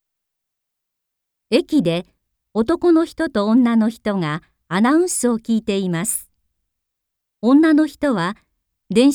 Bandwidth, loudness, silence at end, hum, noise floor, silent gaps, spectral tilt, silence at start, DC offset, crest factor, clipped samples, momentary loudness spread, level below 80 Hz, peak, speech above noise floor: 18.5 kHz; -18 LUFS; 0 s; none; -80 dBFS; none; -5 dB/octave; 1.5 s; under 0.1%; 16 dB; under 0.1%; 10 LU; -54 dBFS; -2 dBFS; 63 dB